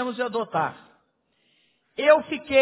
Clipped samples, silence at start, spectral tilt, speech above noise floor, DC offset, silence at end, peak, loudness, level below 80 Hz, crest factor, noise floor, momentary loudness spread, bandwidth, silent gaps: under 0.1%; 0 s; -8.5 dB/octave; 47 dB; under 0.1%; 0 s; -4 dBFS; -23 LUFS; -62 dBFS; 20 dB; -69 dBFS; 11 LU; 4 kHz; none